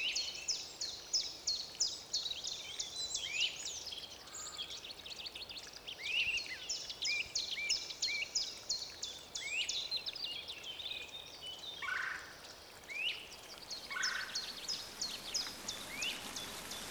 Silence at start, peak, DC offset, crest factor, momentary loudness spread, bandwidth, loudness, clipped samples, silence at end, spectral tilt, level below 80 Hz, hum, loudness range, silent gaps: 0 s; -22 dBFS; under 0.1%; 18 dB; 11 LU; over 20 kHz; -39 LUFS; under 0.1%; 0 s; 1 dB/octave; -68 dBFS; none; 5 LU; none